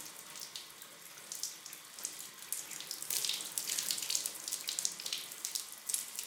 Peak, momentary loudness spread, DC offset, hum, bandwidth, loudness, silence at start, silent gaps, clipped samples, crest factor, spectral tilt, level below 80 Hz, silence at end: -12 dBFS; 13 LU; under 0.1%; none; 19 kHz; -38 LUFS; 0 s; none; under 0.1%; 28 dB; 2 dB/octave; -88 dBFS; 0 s